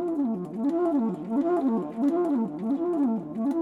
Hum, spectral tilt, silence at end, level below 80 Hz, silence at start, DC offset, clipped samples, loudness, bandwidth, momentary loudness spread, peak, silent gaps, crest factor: none; -9.5 dB/octave; 0 s; -68 dBFS; 0 s; under 0.1%; under 0.1%; -27 LUFS; 4.4 kHz; 4 LU; -14 dBFS; none; 12 dB